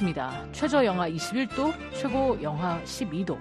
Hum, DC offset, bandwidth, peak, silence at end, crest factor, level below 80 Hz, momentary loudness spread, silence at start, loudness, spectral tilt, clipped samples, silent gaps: none; under 0.1%; 13 kHz; -12 dBFS; 0 s; 16 dB; -50 dBFS; 8 LU; 0 s; -28 LUFS; -5.5 dB/octave; under 0.1%; none